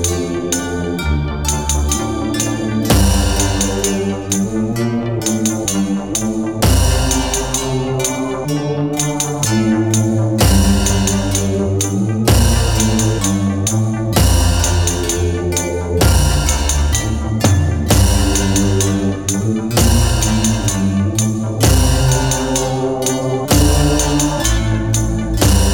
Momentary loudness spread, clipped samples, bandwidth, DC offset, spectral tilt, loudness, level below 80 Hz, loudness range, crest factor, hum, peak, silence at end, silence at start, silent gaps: 6 LU; under 0.1%; 18 kHz; 0.5%; -4.5 dB/octave; -15 LUFS; -22 dBFS; 2 LU; 14 dB; 50 Hz at -35 dBFS; 0 dBFS; 0 s; 0 s; none